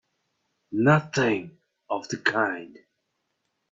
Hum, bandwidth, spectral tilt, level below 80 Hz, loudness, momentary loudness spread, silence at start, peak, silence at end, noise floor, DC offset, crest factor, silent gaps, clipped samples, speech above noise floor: none; 7.6 kHz; -6 dB/octave; -64 dBFS; -25 LUFS; 12 LU; 0.7 s; -6 dBFS; 1.05 s; -78 dBFS; under 0.1%; 22 dB; none; under 0.1%; 53 dB